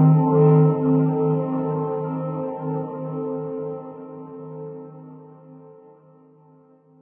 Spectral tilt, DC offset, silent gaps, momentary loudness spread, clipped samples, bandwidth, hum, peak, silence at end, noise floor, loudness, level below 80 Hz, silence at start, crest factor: -15 dB/octave; under 0.1%; none; 22 LU; under 0.1%; 2.8 kHz; none; -6 dBFS; 1.3 s; -53 dBFS; -21 LUFS; -66 dBFS; 0 s; 16 dB